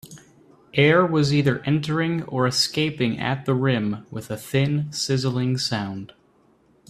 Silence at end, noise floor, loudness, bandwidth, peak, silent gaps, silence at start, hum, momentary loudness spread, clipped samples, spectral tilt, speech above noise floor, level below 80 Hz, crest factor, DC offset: 0.85 s; -59 dBFS; -22 LUFS; 14 kHz; -2 dBFS; none; 0.05 s; none; 10 LU; under 0.1%; -5.5 dB/octave; 37 dB; -58 dBFS; 20 dB; under 0.1%